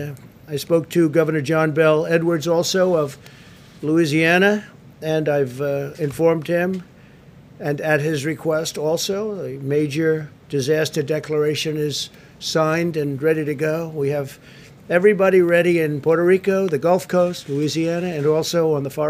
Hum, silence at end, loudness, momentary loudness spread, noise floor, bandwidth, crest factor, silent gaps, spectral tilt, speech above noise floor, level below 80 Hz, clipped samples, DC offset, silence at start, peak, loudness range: none; 0 s; -20 LUFS; 10 LU; -45 dBFS; 16 kHz; 18 dB; none; -5.5 dB/octave; 26 dB; -60 dBFS; under 0.1%; under 0.1%; 0 s; -2 dBFS; 5 LU